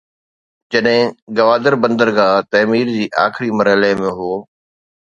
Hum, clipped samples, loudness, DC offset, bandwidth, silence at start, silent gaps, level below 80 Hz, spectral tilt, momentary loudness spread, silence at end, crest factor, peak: none; under 0.1%; -15 LUFS; under 0.1%; 7.6 kHz; 0.7 s; 1.22-1.27 s; -56 dBFS; -6 dB/octave; 7 LU; 0.65 s; 16 dB; 0 dBFS